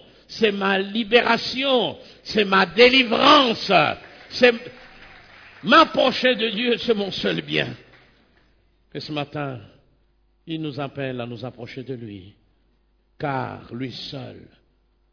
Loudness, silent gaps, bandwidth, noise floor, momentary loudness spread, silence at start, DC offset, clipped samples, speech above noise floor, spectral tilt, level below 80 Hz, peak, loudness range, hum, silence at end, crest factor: -19 LUFS; none; 5.4 kHz; -63 dBFS; 21 LU; 0.3 s; under 0.1%; under 0.1%; 42 dB; -5 dB/octave; -56 dBFS; -2 dBFS; 16 LU; none; 0.75 s; 20 dB